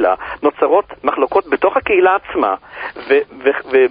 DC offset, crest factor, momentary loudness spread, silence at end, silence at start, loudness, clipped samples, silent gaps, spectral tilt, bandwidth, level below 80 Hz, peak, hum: under 0.1%; 14 dB; 7 LU; 0 s; 0 s; -15 LUFS; under 0.1%; none; -9.5 dB/octave; 5 kHz; -50 dBFS; 0 dBFS; none